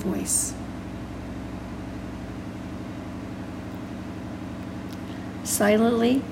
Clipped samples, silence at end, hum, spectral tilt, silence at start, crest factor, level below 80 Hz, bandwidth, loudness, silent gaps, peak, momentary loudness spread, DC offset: under 0.1%; 0 s; none; -4.5 dB/octave; 0 s; 20 dB; -46 dBFS; 16 kHz; -28 LUFS; none; -8 dBFS; 15 LU; under 0.1%